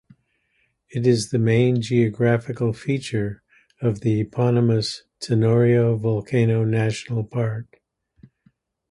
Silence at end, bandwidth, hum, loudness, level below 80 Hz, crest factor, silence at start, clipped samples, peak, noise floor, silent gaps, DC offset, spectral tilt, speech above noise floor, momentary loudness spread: 1.3 s; 11.5 kHz; none; -21 LUFS; -54 dBFS; 16 dB; 0.95 s; under 0.1%; -6 dBFS; -68 dBFS; none; under 0.1%; -7 dB/octave; 48 dB; 9 LU